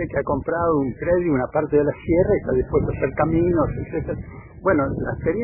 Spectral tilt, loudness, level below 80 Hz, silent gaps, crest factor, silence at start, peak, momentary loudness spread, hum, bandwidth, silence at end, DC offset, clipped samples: -13.5 dB/octave; -21 LUFS; -38 dBFS; none; 14 dB; 0 s; -6 dBFS; 8 LU; none; 3.1 kHz; 0 s; under 0.1%; under 0.1%